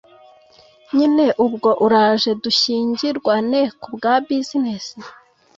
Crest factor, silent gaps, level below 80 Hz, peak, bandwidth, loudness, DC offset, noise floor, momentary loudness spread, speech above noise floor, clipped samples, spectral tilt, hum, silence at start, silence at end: 16 dB; none; -64 dBFS; -4 dBFS; 7.8 kHz; -17 LUFS; under 0.1%; -50 dBFS; 9 LU; 33 dB; under 0.1%; -4.5 dB/octave; none; 0.95 s; 0.45 s